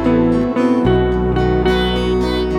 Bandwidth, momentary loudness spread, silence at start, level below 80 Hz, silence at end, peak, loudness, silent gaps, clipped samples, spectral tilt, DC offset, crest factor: 10.5 kHz; 3 LU; 0 s; -24 dBFS; 0 s; -4 dBFS; -15 LUFS; none; under 0.1%; -7.5 dB/octave; under 0.1%; 12 dB